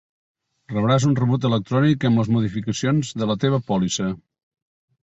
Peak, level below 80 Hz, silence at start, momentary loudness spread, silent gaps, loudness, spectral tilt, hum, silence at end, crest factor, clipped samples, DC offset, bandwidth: -6 dBFS; -52 dBFS; 0.7 s; 7 LU; none; -21 LUFS; -6.5 dB/octave; none; 0.85 s; 16 dB; under 0.1%; under 0.1%; 8 kHz